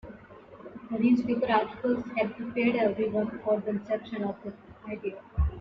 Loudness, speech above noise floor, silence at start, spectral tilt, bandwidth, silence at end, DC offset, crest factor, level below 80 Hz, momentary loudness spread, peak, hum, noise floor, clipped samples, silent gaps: -29 LUFS; 21 dB; 0.05 s; -9 dB/octave; 6 kHz; 0 s; under 0.1%; 18 dB; -42 dBFS; 20 LU; -10 dBFS; none; -49 dBFS; under 0.1%; none